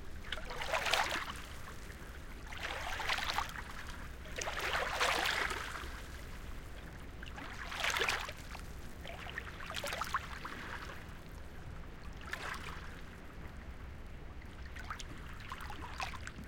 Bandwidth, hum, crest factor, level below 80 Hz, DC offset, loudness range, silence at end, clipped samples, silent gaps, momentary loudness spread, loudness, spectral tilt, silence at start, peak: 17 kHz; none; 28 dB; -50 dBFS; under 0.1%; 11 LU; 0 s; under 0.1%; none; 17 LU; -40 LUFS; -2.5 dB/octave; 0 s; -12 dBFS